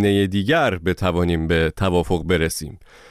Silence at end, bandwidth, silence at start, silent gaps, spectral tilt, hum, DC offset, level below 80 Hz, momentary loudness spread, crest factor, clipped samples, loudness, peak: 0.35 s; 15.5 kHz; 0 s; none; -5.5 dB/octave; none; under 0.1%; -36 dBFS; 5 LU; 12 dB; under 0.1%; -20 LUFS; -8 dBFS